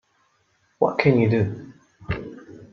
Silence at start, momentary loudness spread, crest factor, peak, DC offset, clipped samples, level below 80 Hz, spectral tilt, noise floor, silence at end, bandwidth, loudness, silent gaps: 0.8 s; 21 LU; 22 dB; -2 dBFS; under 0.1%; under 0.1%; -50 dBFS; -9 dB/octave; -66 dBFS; 0.1 s; 6.8 kHz; -22 LUFS; none